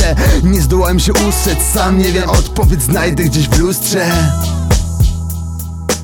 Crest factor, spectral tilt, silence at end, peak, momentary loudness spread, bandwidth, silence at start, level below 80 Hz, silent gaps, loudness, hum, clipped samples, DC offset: 12 dB; -5 dB/octave; 0 s; 0 dBFS; 6 LU; 19 kHz; 0 s; -16 dBFS; none; -13 LUFS; none; under 0.1%; under 0.1%